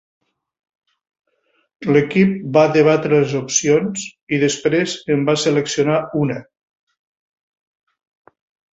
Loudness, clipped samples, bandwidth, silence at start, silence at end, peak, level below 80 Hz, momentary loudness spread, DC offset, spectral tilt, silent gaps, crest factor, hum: -17 LUFS; under 0.1%; 8 kHz; 1.8 s; 2.3 s; -2 dBFS; -60 dBFS; 9 LU; under 0.1%; -5 dB/octave; 4.23-4.27 s; 18 dB; none